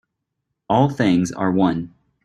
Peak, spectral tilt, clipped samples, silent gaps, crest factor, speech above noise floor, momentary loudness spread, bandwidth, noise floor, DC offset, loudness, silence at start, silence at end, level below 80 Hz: -2 dBFS; -7 dB/octave; under 0.1%; none; 18 dB; 60 dB; 9 LU; 11 kHz; -78 dBFS; under 0.1%; -19 LUFS; 0.7 s; 0.35 s; -52 dBFS